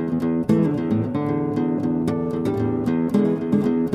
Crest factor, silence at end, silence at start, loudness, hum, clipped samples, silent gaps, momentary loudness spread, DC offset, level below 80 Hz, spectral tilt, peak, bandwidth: 14 dB; 0 s; 0 s; -22 LUFS; none; under 0.1%; none; 3 LU; under 0.1%; -50 dBFS; -9 dB/octave; -6 dBFS; 11 kHz